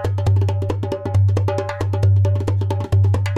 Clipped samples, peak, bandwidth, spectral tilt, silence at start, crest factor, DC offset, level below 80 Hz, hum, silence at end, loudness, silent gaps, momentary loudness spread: under 0.1%; -8 dBFS; 7.8 kHz; -8 dB/octave; 0 s; 10 dB; under 0.1%; -38 dBFS; none; 0 s; -19 LUFS; none; 6 LU